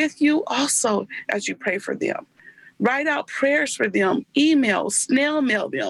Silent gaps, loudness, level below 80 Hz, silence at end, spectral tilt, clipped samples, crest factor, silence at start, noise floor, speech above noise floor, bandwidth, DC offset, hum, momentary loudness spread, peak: none; -21 LUFS; -68 dBFS; 0 s; -3 dB/octave; under 0.1%; 14 dB; 0 s; -44 dBFS; 22 dB; 12.5 kHz; under 0.1%; none; 7 LU; -8 dBFS